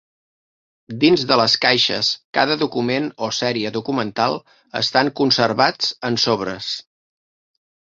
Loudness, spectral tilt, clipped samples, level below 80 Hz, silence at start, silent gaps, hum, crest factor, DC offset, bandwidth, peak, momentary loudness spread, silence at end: -18 LUFS; -4 dB/octave; under 0.1%; -60 dBFS; 0.9 s; 2.25-2.33 s; none; 20 dB; under 0.1%; 7.8 kHz; -2 dBFS; 10 LU; 1.15 s